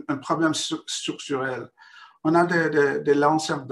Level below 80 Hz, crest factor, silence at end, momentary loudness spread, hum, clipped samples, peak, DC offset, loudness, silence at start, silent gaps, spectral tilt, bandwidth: -70 dBFS; 16 dB; 0 s; 9 LU; none; under 0.1%; -8 dBFS; under 0.1%; -23 LUFS; 0.1 s; none; -4.5 dB/octave; 12.5 kHz